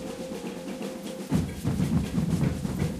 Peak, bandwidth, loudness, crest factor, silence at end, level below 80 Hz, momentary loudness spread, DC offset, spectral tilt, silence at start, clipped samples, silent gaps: -12 dBFS; 15.5 kHz; -30 LUFS; 16 dB; 0 s; -42 dBFS; 9 LU; under 0.1%; -7 dB/octave; 0 s; under 0.1%; none